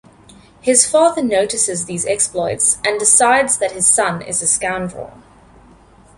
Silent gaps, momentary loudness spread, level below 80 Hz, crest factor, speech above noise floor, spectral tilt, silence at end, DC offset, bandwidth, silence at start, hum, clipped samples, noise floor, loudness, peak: none; 11 LU; -50 dBFS; 18 dB; 30 dB; -2 dB/octave; 1.05 s; under 0.1%; 12 kHz; 0.65 s; none; under 0.1%; -46 dBFS; -14 LUFS; 0 dBFS